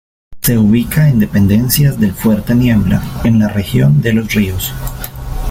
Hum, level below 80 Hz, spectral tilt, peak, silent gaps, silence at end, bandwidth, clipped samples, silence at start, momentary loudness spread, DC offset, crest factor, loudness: none; -28 dBFS; -6 dB/octave; 0 dBFS; none; 0 s; 17 kHz; under 0.1%; 0.3 s; 10 LU; under 0.1%; 12 dB; -12 LUFS